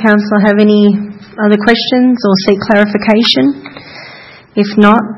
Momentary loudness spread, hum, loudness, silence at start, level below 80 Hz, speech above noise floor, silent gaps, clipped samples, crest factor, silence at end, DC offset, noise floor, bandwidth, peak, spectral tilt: 19 LU; none; -10 LUFS; 0 s; -48 dBFS; 26 dB; none; 0.5%; 10 dB; 0 s; under 0.1%; -34 dBFS; 6 kHz; 0 dBFS; -6.5 dB/octave